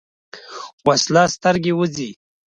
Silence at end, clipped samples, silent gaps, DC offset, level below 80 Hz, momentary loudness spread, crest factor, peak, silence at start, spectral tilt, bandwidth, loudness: 0.4 s; under 0.1%; 0.73-0.78 s; under 0.1%; -56 dBFS; 19 LU; 18 dB; -2 dBFS; 0.35 s; -4 dB/octave; 10 kHz; -18 LUFS